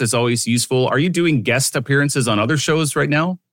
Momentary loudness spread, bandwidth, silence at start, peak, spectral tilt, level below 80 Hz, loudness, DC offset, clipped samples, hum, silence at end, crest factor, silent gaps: 1 LU; 17 kHz; 0 s; -4 dBFS; -4.5 dB/octave; -58 dBFS; -17 LUFS; under 0.1%; under 0.1%; none; 0.15 s; 14 dB; none